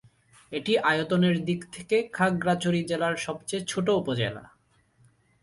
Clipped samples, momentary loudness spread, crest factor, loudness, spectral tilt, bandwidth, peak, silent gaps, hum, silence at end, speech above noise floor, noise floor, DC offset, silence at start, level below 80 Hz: under 0.1%; 8 LU; 18 dB; -27 LUFS; -5.5 dB/octave; 11.5 kHz; -10 dBFS; none; none; 0.95 s; 37 dB; -64 dBFS; under 0.1%; 0.5 s; -62 dBFS